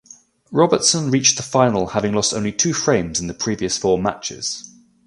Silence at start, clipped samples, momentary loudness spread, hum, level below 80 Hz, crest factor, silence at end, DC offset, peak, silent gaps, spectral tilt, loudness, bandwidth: 0.5 s; under 0.1%; 9 LU; none; -48 dBFS; 20 dB; 0.4 s; under 0.1%; 0 dBFS; none; -3.5 dB/octave; -18 LUFS; 11.5 kHz